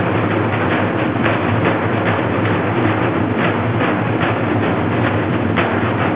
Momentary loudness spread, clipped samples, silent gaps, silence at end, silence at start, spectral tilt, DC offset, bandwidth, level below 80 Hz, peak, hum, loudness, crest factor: 1 LU; under 0.1%; none; 0 s; 0 s; -11 dB/octave; 0.4%; 4 kHz; -38 dBFS; -2 dBFS; none; -17 LUFS; 14 dB